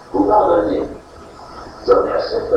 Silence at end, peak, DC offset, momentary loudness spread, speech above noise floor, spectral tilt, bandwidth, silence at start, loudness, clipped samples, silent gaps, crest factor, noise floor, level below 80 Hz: 0 s; 0 dBFS; under 0.1%; 23 LU; 23 dB; -7 dB/octave; 9.2 kHz; 0.05 s; -16 LUFS; under 0.1%; none; 16 dB; -38 dBFS; -42 dBFS